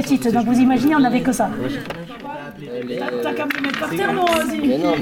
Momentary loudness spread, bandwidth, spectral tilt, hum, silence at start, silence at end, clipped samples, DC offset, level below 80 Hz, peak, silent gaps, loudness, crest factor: 15 LU; 17 kHz; -5 dB/octave; none; 0 s; 0 s; under 0.1%; under 0.1%; -50 dBFS; -6 dBFS; none; -19 LUFS; 14 dB